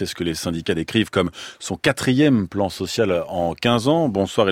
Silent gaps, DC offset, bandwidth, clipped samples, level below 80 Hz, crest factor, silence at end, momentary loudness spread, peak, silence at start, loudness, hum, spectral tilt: none; under 0.1%; 16.5 kHz; under 0.1%; -52 dBFS; 18 dB; 0 s; 7 LU; -2 dBFS; 0 s; -21 LUFS; none; -5.5 dB/octave